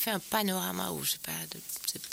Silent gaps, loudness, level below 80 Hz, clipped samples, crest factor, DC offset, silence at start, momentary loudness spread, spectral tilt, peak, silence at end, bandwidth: none; -32 LUFS; -68 dBFS; under 0.1%; 20 dB; under 0.1%; 0 s; 7 LU; -2.5 dB/octave; -14 dBFS; 0 s; 17 kHz